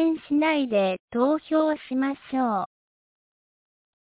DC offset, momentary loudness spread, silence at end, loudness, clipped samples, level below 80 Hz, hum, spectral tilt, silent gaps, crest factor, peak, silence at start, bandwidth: under 0.1%; 5 LU; 1.4 s; -25 LUFS; under 0.1%; -68 dBFS; none; -9.5 dB/octave; 1.00-1.08 s; 14 dB; -12 dBFS; 0 s; 4 kHz